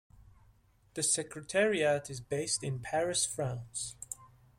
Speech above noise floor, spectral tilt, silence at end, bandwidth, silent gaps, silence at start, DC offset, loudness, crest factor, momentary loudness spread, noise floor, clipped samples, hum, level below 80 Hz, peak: 32 dB; -3 dB/octave; 0.3 s; 16.5 kHz; none; 0.15 s; under 0.1%; -32 LUFS; 18 dB; 13 LU; -65 dBFS; under 0.1%; none; -64 dBFS; -16 dBFS